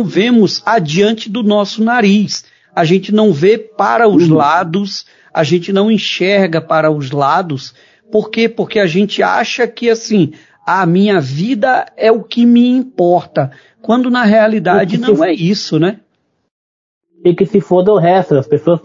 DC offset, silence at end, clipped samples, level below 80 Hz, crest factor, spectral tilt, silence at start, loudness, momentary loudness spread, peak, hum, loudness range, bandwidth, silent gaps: under 0.1%; 0.05 s; under 0.1%; -58 dBFS; 12 dB; -6 dB/octave; 0 s; -12 LUFS; 8 LU; 0 dBFS; none; 3 LU; 7.6 kHz; 16.51-17.01 s